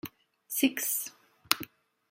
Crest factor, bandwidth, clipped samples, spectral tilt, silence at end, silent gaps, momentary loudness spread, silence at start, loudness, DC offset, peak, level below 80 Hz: 34 dB; 16.5 kHz; under 0.1%; -1 dB/octave; 0.45 s; none; 17 LU; 0.05 s; -30 LUFS; under 0.1%; 0 dBFS; -76 dBFS